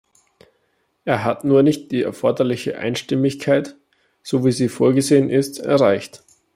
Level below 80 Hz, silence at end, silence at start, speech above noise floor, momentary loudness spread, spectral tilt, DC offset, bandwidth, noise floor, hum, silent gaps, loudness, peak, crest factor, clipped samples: -62 dBFS; 0.4 s; 1.05 s; 49 dB; 9 LU; -6 dB/octave; under 0.1%; 15.5 kHz; -67 dBFS; none; none; -19 LUFS; -2 dBFS; 18 dB; under 0.1%